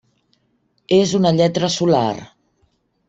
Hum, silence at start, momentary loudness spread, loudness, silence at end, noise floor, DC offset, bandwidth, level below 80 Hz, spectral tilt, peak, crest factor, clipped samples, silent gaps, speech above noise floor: none; 0.9 s; 6 LU; -17 LUFS; 0.85 s; -65 dBFS; under 0.1%; 8.2 kHz; -56 dBFS; -5.5 dB/octave; -2 dBFS; 16 dB; under 0.1%; none; 49 dB